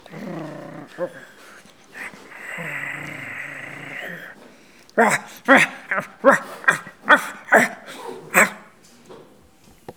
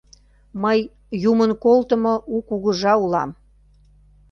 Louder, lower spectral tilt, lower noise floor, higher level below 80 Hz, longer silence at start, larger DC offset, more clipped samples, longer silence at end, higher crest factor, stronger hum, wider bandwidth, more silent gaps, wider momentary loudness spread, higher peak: about the same, -19 LUFS vs -20 LUFS; second, -3.5 dB/octave vs -6.5 dB/octave; about the same, -52 dBFS vs -53 dBFS; second, -68 dBFS vs -52 dBFS; second, 0.1 s vs 0.55 s; first, 0.1% vs under 0.1%; neither; second, 0.05 s vs 1 s; first, 24 dB vs 16 dB; second, none vs 50 Hz at -45 dBFS; first, over 20 kHz vs 7 kHz; neither; first, 19 LU vs 9 LU; first, 0 dBFS vs -4 dBFS